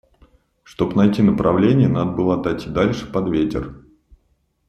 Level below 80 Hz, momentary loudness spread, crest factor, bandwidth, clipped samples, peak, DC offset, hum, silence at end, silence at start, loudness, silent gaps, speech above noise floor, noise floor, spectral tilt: -42 dBFS; 8 LU; 16 dB; 8.2 kHz; under 0.1%; -2 dBFS; under 0.1%; none; 0.9 s; 0.8 s; -18 LUFS; none; 47 dB; -65 dBFS; -8.5 dB/octave